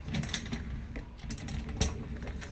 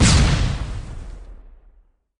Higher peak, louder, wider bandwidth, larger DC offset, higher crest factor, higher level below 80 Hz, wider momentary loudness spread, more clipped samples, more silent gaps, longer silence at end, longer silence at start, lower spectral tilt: second, -14 dBFS vs -4 dBFS; second, -38 LUFS vs -20 LUFS; second, 9 kHz vs 10.5 kHz; neither; first, 24 dB vs 16 dB; second, -42 dBFS vs -24 dBFS; second, 9 LU vs 24 LU; neither; neither; second, 0 s vs 0.85 s; about the same, 0 s vs 0 s; about the same, -4.5 dB/octave vs -4.5 dB/octave